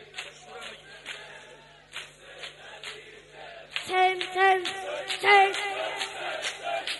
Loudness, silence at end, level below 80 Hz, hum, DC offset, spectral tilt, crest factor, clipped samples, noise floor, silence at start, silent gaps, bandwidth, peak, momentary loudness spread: -25 LUFS; 0 s; -68 dBFS; 50 Hz at -65 dBFS; under 0.1%; -1.5 dB/octave; 20 dB; under 0.1%; -51 dBFS; 0 s; none; 11.5 kHz; -10 dBFS; 24 LU